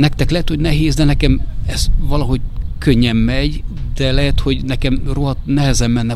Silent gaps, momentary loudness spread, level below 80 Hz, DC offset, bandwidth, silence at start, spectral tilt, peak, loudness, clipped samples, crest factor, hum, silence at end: none; 7 LU; -18 dBFS; under 0.1%; 13.5 kHz; 0 s; -5.5 dB/octave; 0 dBFS; -17 LUFS; under 0.1%; 14 dB; none; 0 s